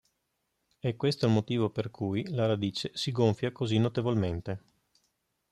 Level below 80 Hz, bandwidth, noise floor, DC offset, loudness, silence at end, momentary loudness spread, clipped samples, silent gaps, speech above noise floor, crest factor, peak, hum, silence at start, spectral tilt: -62 dBFS; 12 kHz; -80 dBFS; under 0.1%; -30 LUFS; 0.95 s; 8 LU; under 0.1%; none; 51 dB; 18 dB; -12 dBFS; none; 0.85 s; -7 dB/octave